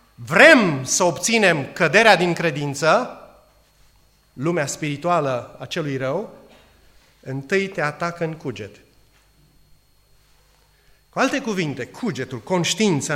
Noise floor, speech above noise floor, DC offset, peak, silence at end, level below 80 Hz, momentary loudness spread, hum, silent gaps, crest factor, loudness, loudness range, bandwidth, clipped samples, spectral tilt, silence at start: -57 dBFS; 38 dB; under 0.1%; 0 dBFS; 0 s; -60 dBFS; 17 LU; 50 Hz at -55 dBFS; none; 22 dB; -19 LUFS; 12 LU; 16 kHz; under 0.1%; -4 dB/octave; 0.2 s